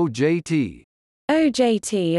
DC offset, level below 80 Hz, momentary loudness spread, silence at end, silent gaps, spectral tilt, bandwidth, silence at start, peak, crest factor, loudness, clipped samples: under 0.1%; -58 dBFS; 8 LU; 0 s; 0.84-1.28 s; -5.5 dB/octave; 12 kHz; 0 s; -6 dBFS; 14 dB; -21 LUFS; under 0.1%